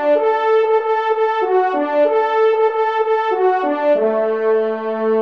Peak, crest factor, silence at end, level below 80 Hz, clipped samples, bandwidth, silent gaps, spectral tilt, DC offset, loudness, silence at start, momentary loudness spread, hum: -6 dBFS; 10 dB; 0 s; -70 dBFS; under 0.1%; 6 kHz; none; -6 dB/octave; 0.2%; -16 LUFS; 0 s; 3 LU; none